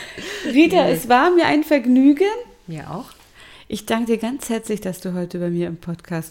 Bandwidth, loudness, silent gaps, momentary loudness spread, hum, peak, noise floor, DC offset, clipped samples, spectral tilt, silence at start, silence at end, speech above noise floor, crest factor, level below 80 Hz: 17 kHz; -18 LUFS; none; 17 LU; none; -2 dBFS; -45 dBFS; under 0.1%; under 0.1%; -5.5 dB/octave; 0 s; 0 s; 27 dB; 18 dB; -52 dBFS